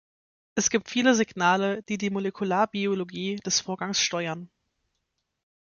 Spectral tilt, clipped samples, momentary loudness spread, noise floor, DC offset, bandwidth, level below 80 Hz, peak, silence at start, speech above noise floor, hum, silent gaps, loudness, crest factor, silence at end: -3 dB/octave; under 0.1%; 9 LU; -79 dBFS; under 0.1%; 7.4 kHz; -68 dBFS; -8 dBFS; 0.55 s; 53 dB; none; none; -26 LUFS; 20 dB; 1.2 s